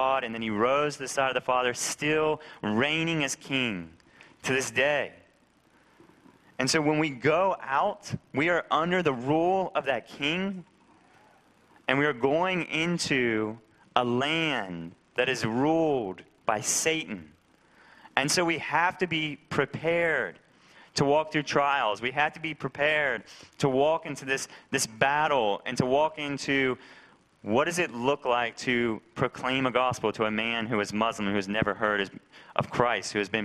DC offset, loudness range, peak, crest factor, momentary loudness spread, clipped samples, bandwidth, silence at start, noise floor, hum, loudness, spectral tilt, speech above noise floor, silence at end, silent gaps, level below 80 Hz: under 0.1%; 2 LU; -2 dBFS; 26 dB; 8 LU; under 0.1%; 15 kHz; 0 s; -63 dBFS; none; -27 LUFS; -4 dB/octave; 36 dB; 0 s; none; -62 dBFS